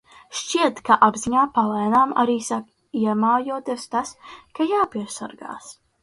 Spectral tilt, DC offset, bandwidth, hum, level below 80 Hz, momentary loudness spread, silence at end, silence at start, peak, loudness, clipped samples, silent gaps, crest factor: -4 dB/octave; under 0.1%; 11.5 kHz; none; -60 dBFS; 16 LU; 0.3 s; 0.3 s; 0 dBFS; -21 LUFS; under 0.1%; none; 22 dB